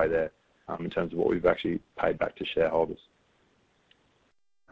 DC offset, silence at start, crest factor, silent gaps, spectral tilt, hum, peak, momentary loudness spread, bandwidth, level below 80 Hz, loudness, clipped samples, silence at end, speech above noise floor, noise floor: under 0.1%; 0 s; 20 dB; none; -7.5 dB/octave; none; -10 dBFS; 11 LU; 7.4 kHz; -56 dBFS; -29 LUFS; under 0.1%; 1.75 s; 42 dB; -70 dBFS